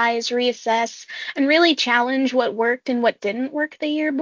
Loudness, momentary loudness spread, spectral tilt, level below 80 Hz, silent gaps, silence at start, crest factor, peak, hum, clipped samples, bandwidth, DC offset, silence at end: -20 LUFS; 9 LU; -2.5 dB/octave; -72 dBFS; none; 0 s; 16 dB; -4 dBFS; none; under 0.1%; 7.6 kHz; under 0.1%; 0 s